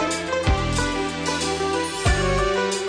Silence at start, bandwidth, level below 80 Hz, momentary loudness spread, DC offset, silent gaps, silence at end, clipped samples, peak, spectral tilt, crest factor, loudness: 0 s; 11 kHz; -30 dBFS; 3 LU; under 0.1%; none; 0 s; under 0.1%; -10 dBFS; -4 dB/octave; 12 dB; -22 LUFS